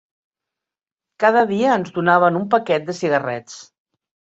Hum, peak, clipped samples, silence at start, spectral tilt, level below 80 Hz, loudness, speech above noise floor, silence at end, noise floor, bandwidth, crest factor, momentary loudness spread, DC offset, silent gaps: none; -2 dBFS; under 0.1%; 1.2 s; -6 dB/octave; -64 dBFS; -18 LUFS; 70 dB; 0.7 s; -88 dBFS; 8 kHz; 18 dB; 13 LU; under 0.1%; none